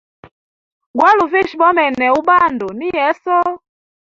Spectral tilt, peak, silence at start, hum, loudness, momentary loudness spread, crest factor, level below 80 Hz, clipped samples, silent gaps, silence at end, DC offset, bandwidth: -5 dB/octave; -2 dBFS; 0.95 s; none; -14 LUFS; 10 LU; 14 dB; -54 dBFS; under 0.1%; none; 0.55 s; under 0.1%; 7.4 kHz